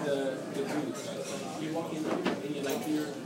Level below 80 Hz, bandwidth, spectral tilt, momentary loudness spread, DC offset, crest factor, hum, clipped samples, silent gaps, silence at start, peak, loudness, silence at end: -76 dBFS; 16 kHz; -5 dB/octave; 5 LU; under 0.1%; 16 dB; none; under 0.1%; none; 0 s; -18 dBFS; -34 LUFS; 0 s